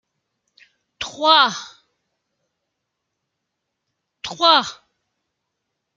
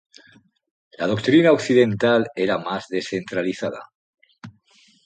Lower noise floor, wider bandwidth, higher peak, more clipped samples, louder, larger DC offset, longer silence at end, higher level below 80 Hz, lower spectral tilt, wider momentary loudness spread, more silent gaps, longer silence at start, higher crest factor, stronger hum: first, -79 dBFS vs -57 dBFS; second, 7.8 kHz vs 9.2 kHz; first, 0 dBFS vs -4 dBFS; neither; first, -15 LUFS vs -20 LUFS; neither; first, 1.25 s vs 0.55 s; about the same, -66 dBFS vs -62 dBFS; second, -1.5 dB/octave vs -6 dB/octave; first, 19 LU vs 12 LU; second, none vs 3.95-4.13 s; about the same, 1 s vs 1 s; first, 24 dB vs 18 dB; neither